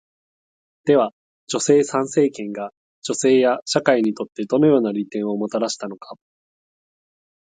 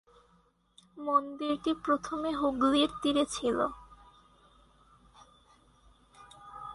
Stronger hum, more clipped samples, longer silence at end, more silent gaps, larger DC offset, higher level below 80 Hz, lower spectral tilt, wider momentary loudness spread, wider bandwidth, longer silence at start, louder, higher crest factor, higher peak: neither; neither; first, 1.4 s vs 0 s; first, 1.13-1.47 s, 2.77-3.02 s, 3.62-3.66 s vs none; neither; second, -68 dBFS vs -60 dBFS; about the same, -4.5 dB/octave vs -3.5 dB/octave; second, 13 LU vs 18 LU; second, 9.4 kHz vs 11.5 kHz; about the same, 0.85 s vs 0.95 s; first, -20 LUFS vs -30 LUFS; about the same, 20 dB vs 20 dB; first, 0 dBFS vs -12 dBFS